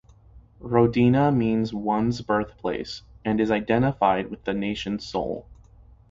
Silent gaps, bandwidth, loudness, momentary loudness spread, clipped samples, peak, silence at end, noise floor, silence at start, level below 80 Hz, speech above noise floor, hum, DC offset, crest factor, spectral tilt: none; 7.6 kHz; -24 LUFS; 13 LU; under 0.1%; -6 dBFS; 0.55 s; -51 dBFS; 0.35 s; -48 dBFS; 28 dB; none; under 0.1%; 20 dB; -7.5 dB/octave